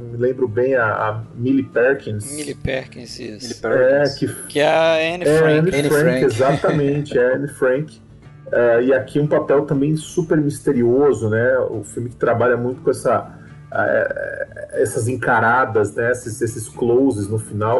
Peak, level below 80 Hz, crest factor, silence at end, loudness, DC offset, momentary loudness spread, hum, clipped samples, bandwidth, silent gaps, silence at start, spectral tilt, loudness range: -2 dBFS; -48 dBFS; 16 dB; 0 s; -18 LUFS; under 0.1%; 11 LU; none; under 0.1%; 12 kHz; none; 0 s; -6 dB/octave; 4 LU